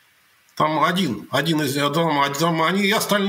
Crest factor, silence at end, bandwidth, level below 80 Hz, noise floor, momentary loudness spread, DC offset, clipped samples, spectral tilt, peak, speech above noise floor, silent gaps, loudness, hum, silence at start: 16 dB; 0 s; 16 kHz; -66 dBFS; -57 dBFS; 4 LU; under 0.1%; under 0.1%; -4.5 dB/octave; -4 dBFS; 38 dB; none; -20 LUFS; none; 0.55 s